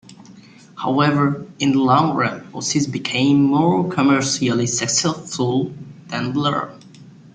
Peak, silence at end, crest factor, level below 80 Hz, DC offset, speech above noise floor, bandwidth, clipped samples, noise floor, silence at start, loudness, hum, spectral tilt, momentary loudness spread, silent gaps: -4 dBFS; 0.25 s; 16 dB; -58 dBFS; under 0.1%; 26 dB; 9.6 kHz; under 0.1%; -44 dBFS; 0.1 s; -19 LUFS; none; -4.5 dB/octave; 11 LU; none